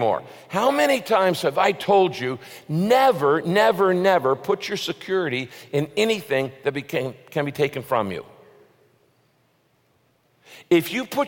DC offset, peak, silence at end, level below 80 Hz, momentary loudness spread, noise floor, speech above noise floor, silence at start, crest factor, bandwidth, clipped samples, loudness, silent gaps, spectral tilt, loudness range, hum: under 0.1%; -4 dBFS; 0 s; -68 dBFS; 11 LU; -64 dBFS; 43 dB; 0 s; 18 dB; 17 kHz; under 0.1%; -22 LUFS; none; -5 dB/octave; 9 LU; none